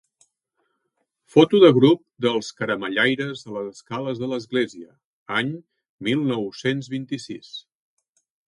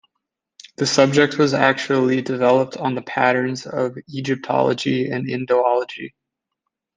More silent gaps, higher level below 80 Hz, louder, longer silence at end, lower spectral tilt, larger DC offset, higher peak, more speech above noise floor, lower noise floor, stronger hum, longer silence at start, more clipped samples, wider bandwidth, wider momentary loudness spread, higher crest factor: first, 5.04-5.26 s, 5.89-5.98 s vs none; about the same, -68 dBFS vs -64 dBFS; second, -22 LUFS vs -19 LUFS; about the same, 0.9 s vs 0.9 s; about the same, -6 dB/octave vs -5 dB/octave; neither; about the same, 0 dBFS vs -2 dBFS; second, 54 dB vs 61 dB; second, -75 dBFS vs -80 dBFS; neither; first, 1.35 s vs 0.8 s; neither; first, 11 kHz vs 9.8 kHz; first, 18 LU vs 9 LU; about the same, 22 dB vs 18 dB